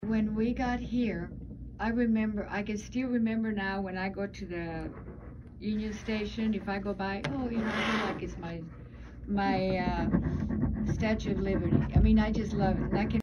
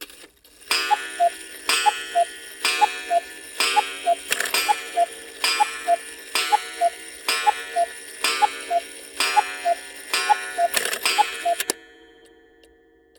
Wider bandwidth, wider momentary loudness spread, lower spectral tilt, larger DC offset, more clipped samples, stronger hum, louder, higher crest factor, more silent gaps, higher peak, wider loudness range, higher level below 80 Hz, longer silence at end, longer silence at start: second, 7 kHz vs over 20 kHz; first, 13 LU vs 6 LU; first, -7.5 dB/octave vs 1.5 dB/octave; neither; neither; neither; second, -31 LUFS vs -22 LUFS; about the same, 20 dB vs 22 dB; neither; second, -12 dBFS vs -2 dBFS; first, 6 LU vs 1 LU; first, -40 dBFS vs -66 dBFS; second, 0 s vs 1.35 s; about the same, 0 s vs 0 s